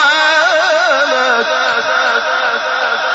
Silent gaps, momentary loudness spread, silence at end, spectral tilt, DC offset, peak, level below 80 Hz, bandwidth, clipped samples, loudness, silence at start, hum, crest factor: none; 5 LU; 0 s; 3.5 dB/octave; under 0.1%; -2 dBFS; -64 dBFS; 8 kHz; under 0.1%; -12 LUFS; 0 s; none; 12 dB